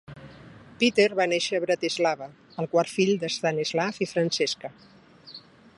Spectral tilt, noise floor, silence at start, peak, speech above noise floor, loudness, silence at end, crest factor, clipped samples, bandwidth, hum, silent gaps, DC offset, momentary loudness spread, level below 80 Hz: -4 dB/octave; -48 dBFS; 0.1 s; -8 dBFS; 23 dB; -25 LUFS; 0.4 s; 20 dB; under 0.1%; 11.5 kHz; none; none; under 0.1%; 22 LU; -68 dBFS